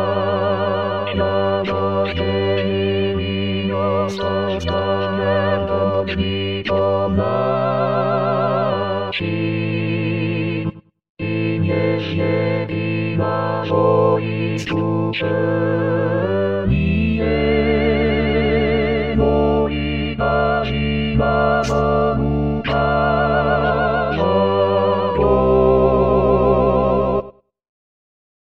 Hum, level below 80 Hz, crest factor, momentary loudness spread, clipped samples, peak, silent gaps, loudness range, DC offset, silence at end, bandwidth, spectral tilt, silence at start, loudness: none; -32 dBFS; 14 dB; 6 LU; under 0.1%; -4 dBFS; 11.09-11.15 s; 5 LU; 0.8%; 0.9 s; 8 kHz; -7.5 dB/octave; 0 s; -18 LUFS